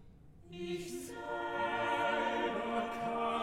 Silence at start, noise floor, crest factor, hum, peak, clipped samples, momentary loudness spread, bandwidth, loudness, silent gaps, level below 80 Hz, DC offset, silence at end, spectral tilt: 0 s; -56 dBFS; 16 dB; none; -22 dBFS; under 0.1%; 10 LU; 16.5 kHz; -36 LUFS; none; -64 dBFS; under 0.1%; 0 s; -4.5 dB/octave